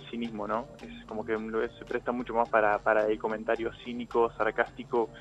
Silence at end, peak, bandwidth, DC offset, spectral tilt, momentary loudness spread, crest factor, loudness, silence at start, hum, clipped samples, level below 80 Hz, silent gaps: 0 s; -10 dBFS; 8.6 kHz; under 0.1%; -6.5 dB/octave; 12 LU; 20 dB; -30 LUFS; 0 s; none; under 0.1%; -56 dBFS; none